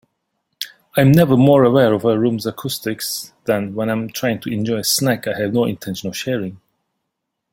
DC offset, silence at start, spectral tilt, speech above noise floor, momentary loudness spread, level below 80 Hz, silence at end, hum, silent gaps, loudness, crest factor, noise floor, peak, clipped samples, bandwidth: under 0.1%; 0.6 s; -5.5 dB/octave; 60 dB; 13 LU; -54 dBFS; 0.95 s; none; none; -17 LUFS; 16 dB; -77 dBFS; -2 dBFS; under 0.1%; 17 kHz